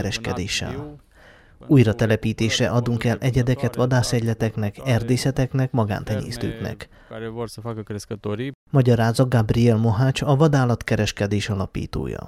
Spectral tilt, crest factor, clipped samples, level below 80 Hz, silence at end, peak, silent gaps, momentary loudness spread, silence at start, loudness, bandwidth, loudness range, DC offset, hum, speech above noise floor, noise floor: -6 dB/octave; 18 dB; under 0.1%; -42 dBFS; 0 s; -4 dBFS; 8.55-8.66 s; 13 LU; 0 s; -21 LUFS; 14 kHz; 6 LU; under 0.1%; none; 29 dB; -50 dBFS